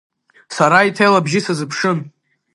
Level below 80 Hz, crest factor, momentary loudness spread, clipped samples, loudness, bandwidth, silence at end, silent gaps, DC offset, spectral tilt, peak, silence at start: -66 dBFS; 16 dB; 10 LU; under 0.1%; -15 LUFS; 11.5 kHz; 0.45 s; none; under 0.1%; -5 dB/octave; 0 dBFS; 0.5 s